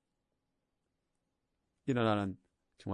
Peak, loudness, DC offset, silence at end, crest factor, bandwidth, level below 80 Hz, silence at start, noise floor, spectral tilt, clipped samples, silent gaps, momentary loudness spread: -20 dBFS; -35 LUFS; under 0.1%; 0 s; 20 dB; 9.8 kHz; -78 dBFS; 1.85 s; -85 dBFS; -7.5 dB/octave; under 0.1%; none; 18 LU